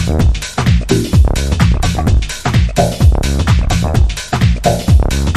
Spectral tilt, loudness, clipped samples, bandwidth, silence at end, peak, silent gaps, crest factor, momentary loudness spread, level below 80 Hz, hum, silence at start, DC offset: -6 dB/octave; -13 LUFS; under 0.1%; 14 kHz; 0 s; 0 dBFS; none; 12 dB; 3 LU; -14 dBFS; none; 0 s; under 0.1%